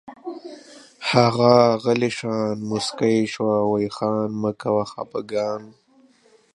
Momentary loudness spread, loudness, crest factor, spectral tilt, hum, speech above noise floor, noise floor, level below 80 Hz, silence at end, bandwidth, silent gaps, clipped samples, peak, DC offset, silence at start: 17 LU; -21 LUFS; 22 dB; -6 dB/octave; none; 36 dB; -56 dBFS; -62 dBFS; 0.85 s; 11.5 kHz; none; under 0.1%; 0 dBFS; under 0.1%; 0.05 s